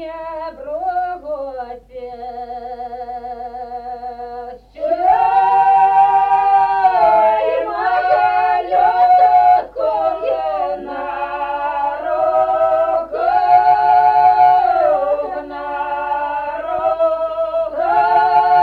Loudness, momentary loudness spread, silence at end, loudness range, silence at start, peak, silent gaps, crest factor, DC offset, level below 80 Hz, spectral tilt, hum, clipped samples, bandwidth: -15 LUFS; 17 LU; 0 s; 13 LU; 0 s; -2 dBFS; none; 14 dB; under 0.1%; -50 dBFS; -5.5 dB/octave; none; under 0.1%; 5 kHz